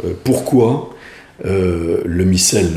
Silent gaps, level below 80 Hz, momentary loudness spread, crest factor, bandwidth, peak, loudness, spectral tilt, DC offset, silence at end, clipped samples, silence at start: none; -38 dBFS; 10 LU; 14 dB; 15.5 kHz; 0 dBFS; -15 LUFS; -5 dB/octave; under 0.1%; 0 s; under 0.1%; 0 s